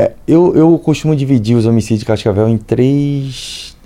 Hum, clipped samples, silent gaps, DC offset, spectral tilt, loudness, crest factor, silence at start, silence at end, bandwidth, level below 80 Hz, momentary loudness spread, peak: none; under 0.1%; none; under 0.1%; -7.5 dB/octave; -12 LUFS; 12 dB; 0 s; 0.15 s; 13 kHz; -40 dBFS; 9 LU; 0 dBFS